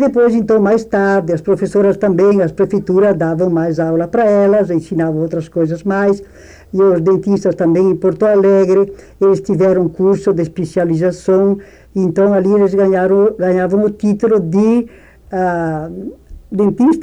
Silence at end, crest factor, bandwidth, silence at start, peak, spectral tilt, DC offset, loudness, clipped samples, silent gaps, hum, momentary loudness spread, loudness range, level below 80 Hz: 0 s; 10 dB; 9.8 kHz; 0 s; -4 dBFS; -8.5 dB/octave; under 0.1%; -13 LUFS; under 0.1%; none; none; 7 LU; 2 LU; -44 dBFS